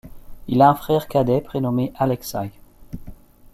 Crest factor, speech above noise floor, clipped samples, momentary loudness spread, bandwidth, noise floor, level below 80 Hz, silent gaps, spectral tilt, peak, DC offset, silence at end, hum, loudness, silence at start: 18 dB; 21 dB; under 0.1%; 23 LU; 15.5 kHz; -40 dBFS; -44 dBFS; none; -7 dB/octave; -2 dBFS; under 0.1%; 0.4 s; none; -20 LUFS; 0.05 s